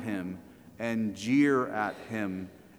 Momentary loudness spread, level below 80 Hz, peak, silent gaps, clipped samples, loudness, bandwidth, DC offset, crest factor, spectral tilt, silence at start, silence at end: 15 LU; -68 dBFS; -14 dBFS; none; under 0.1%; -30 LUFS; 13.5 kHz; under 0.1%; 16 dB; -6 dB/octave; 0 s; 0.2 s